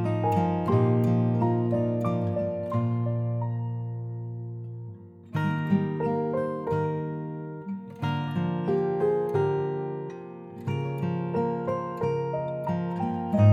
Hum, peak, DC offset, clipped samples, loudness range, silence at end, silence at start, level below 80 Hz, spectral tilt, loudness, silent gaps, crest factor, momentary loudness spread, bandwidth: none; -8 dBFS; under 0.1%; under 0.1%; 4 LU; 0 s; 0 s; -62 dBFS; -10 dB/octave; -28 LUFS; none; 18 dB; 13 LU; 7 kHz